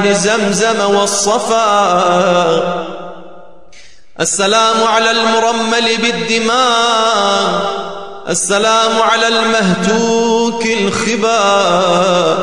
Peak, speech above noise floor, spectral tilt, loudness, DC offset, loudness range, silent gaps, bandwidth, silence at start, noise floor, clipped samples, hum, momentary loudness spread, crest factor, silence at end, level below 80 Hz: 0 dBFS; 31 dB; -3 dB/octave; -12 LUFS; 1%; 2 LU; none; 12.5 kHz; 0 s; -43 dBFS; under 0.1%; none; 6 LU; 12 dB; 0 s; -50 dBFS